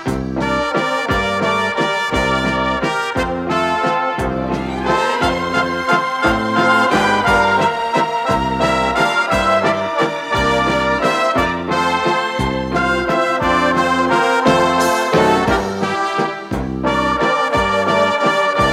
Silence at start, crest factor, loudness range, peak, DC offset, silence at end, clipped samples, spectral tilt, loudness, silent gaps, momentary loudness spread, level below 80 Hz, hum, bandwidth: 0 s; 16 dB; 3 LU; 0 dBFS; under 0.1%; 0 s; under 0.1%; -4.5 dB/octave; -16 LUFS; none; 5 LU; -36 dBFS; none; 16 kHz